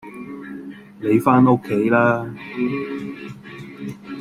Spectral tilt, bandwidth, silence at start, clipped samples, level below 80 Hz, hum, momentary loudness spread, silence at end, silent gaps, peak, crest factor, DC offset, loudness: -8.5 dB/octave; 14.5 kHz; 0.05 s; under 0.1%; -58 dBFS; none; 21 LU; 0 s; none; -2 dBFS; 18 dB; under 0.1%; -19 LUFS